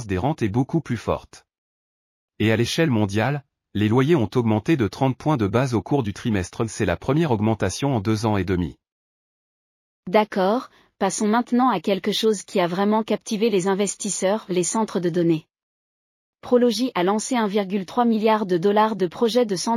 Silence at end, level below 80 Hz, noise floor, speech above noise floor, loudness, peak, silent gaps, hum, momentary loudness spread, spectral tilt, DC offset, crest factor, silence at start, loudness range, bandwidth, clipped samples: 0 s; -52 dBFS; under -90 dBFS; over 69 dB; -22 LUFS; -6 dBFS; 1.58-2.28 s, 8.92-10.03 s, 15.63-16.33 s; none; 6 LU; -5.5 dB/octave; under 0.1%; 16 dB; 0 s; 3 LU; 15 kHz; under 0.1%